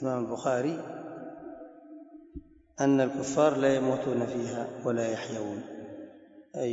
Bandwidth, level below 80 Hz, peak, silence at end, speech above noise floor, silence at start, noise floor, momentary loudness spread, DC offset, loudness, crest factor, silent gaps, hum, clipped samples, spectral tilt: 8 kHz; -62 dBFS; -10 dBFS; 0 s; 23 dB; 0 s; -52 dBFS; 23 LU; under 0.1%; -29 LUFS; 20 dB; none; none; under 0.1%; -6 dB/octave